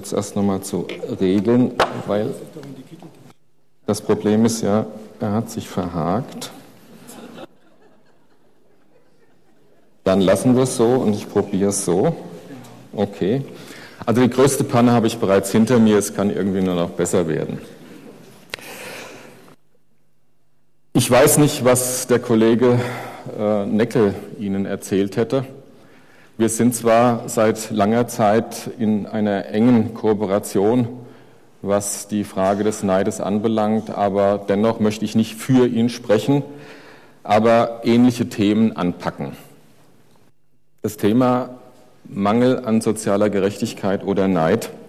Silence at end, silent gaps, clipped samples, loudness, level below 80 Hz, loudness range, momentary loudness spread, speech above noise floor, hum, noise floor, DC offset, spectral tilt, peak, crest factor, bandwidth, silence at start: 0 s; none; under 0.1%; -19 LUFS; -54 dBFS; 7 LU; 17 LU; 49 dB; none; -67 dBFS; 0.3%; -5.5 dB/octave; -6 dBFS; 14 dB; 15 kHz; 0 s